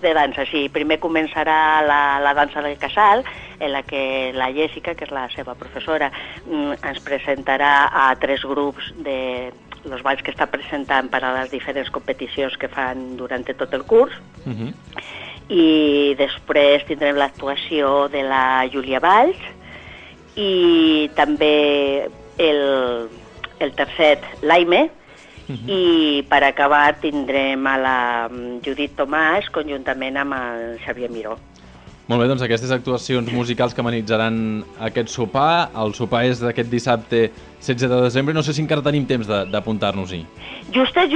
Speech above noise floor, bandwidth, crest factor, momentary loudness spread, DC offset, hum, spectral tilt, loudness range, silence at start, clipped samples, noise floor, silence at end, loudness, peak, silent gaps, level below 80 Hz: 24 dB; 9.4 kHz; 18 dB; 15 LU; under 0.1%; none; -5.5 dB/octave; 6 LU; 0 s; under 0.1%; -43 dBFS; 0 s; -19 LUFS; -2 dBFS; none; -48 dBFS